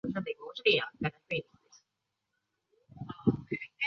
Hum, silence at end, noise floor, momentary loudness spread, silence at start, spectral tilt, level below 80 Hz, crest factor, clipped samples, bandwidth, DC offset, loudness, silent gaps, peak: none; 0 s; -85 dBFS; 12 LU; 0.05 s; -3.5 dB/octave; -64 dBFS; 24 dB; under 0.1%; 6.8 kHz; under 0.1%; -32 LUFS; none; -12 dBFS